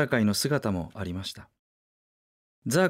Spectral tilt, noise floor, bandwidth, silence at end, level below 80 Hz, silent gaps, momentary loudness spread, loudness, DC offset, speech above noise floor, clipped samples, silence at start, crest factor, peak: -5 dB/octave; under -90 dBFS; 16 kHz; 0 s; -58 dBFS; 1.59-2.62 s; 15 LU; -28 LUFS; under 0.1%; over 62 dB; under 0.1%; 0 s; 18 dB; -10 dBFS